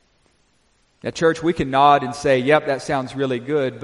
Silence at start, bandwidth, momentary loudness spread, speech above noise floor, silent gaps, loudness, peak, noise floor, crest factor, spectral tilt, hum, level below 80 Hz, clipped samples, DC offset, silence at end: 1.05 s; 11.5 kHz; 9 LU; 43 dB; none; -19 LUFS; -2 dBFS; -62 dBFS; 18 dB; -5.5 dB/octave; none; -50 dBFS; under 0.1%; under 0.1%; 0 s